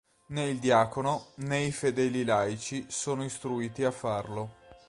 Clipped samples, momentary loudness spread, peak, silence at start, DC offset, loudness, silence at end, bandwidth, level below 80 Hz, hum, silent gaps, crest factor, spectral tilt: under 0.1%; 10 LU; -10 dBFS; 0.3 s; under 0.1%; -30 LUFS; 0.1 s; 11.5 kHz; -62 dBFS; none; none; 20 dB; -5 dB/octave